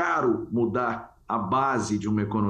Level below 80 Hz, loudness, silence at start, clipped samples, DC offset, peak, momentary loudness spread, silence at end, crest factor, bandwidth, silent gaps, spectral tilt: -56 dBFS; -26 LUFS; 0 s; under 0.1%; under 0.1%; -12 dBFS; 6 LU; 0 s; 12 dB; 10 kHz; none; -6.5 dB/octave